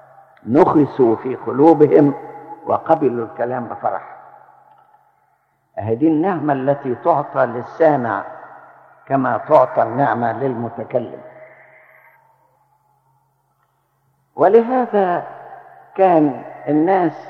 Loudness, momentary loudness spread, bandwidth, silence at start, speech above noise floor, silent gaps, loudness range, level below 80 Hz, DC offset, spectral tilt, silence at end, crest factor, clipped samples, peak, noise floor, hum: -17 LUFS; 18 LU; 5.6 kHz; 0.45 s; 48 dB; none; 8 LU; -66 dBFS; under 0.1%; -10 dB/octave; 0 s; 18 dB; under 0.1%; 0 dBFS; -64 dBFS; none